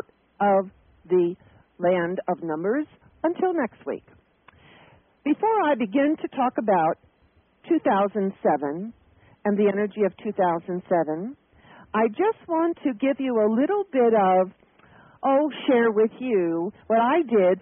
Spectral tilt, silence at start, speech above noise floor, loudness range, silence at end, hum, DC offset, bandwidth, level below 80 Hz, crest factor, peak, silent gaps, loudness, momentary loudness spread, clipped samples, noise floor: -2.5 dB/octave; 0.4 s; 39 dB; 5 LU; 0 s; none; under 0.1%; 3.6 kHz; -68 dBFS; 14 dB; -10 dBFS; none; -24 LUFS; 10 LU; under 0.1%; -62 dBFS